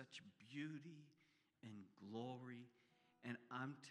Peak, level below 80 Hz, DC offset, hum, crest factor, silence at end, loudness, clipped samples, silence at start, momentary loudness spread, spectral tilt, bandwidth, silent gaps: -34 dBFS; under -90 dBFS; under 0.1%; none; 20 dB; 0 s; -55 LUFS; under 0.1%; 0 s; 11 LU; -6 dB/octave; 11.5 kHz; none